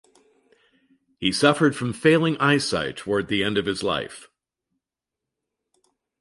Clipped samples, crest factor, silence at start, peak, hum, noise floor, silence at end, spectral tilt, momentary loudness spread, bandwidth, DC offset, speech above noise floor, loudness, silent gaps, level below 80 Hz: under 0.1%; 22 dB; 1.2 s; -4 dBFS; none; -87 dBFS; 1.95 s; -5 dB/octave; 8 LU; 11.5 kHz; under 0.1%; 65 dB; -22 LUFS; none; -56 dBFS